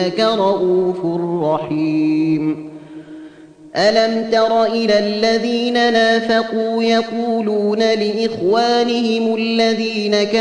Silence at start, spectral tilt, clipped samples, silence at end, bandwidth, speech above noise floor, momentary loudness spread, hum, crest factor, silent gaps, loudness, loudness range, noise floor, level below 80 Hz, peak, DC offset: 0 s; -5 dB/octave; under 0.1%; 0 s; 10 kHz; 24 dB; 6 LU; none; 14 dB; none; -16 LUFS; 3 LU; -40 dBFS; -60 dBFS; -2 dBFS; under 0.1%